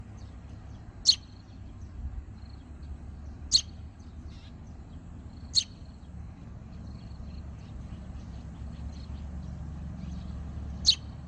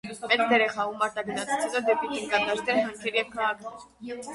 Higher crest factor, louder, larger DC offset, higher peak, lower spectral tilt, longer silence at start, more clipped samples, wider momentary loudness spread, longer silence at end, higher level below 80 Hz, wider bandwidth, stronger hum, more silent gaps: first, 26 dB vs 18 dB; second, -30 LUFS vs -26 LUFS; neither; about the same, -10 dBFS vs -8 dBFS; about the same, -2.5 dB/octave vs -3 dB/octave; about the same, 0 s vs 0.05 s; neither; first, 22 LU vs 15 LU; about the same, 0 s vs 0 s; first, -44 dBFS vs -66 dBFS; second, 9.6 kHz vs 11.5 kHz; neither; neither